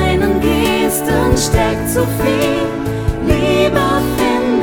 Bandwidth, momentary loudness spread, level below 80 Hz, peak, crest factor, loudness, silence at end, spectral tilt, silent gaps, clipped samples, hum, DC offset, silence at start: over 20 kHz; 5 LU; -26 dBFS; 0 dBFS; 14 dB; -14 LUFS; 0 s; -5 dB/octave; none; under 0.1%; none; under 0.1%; 0 s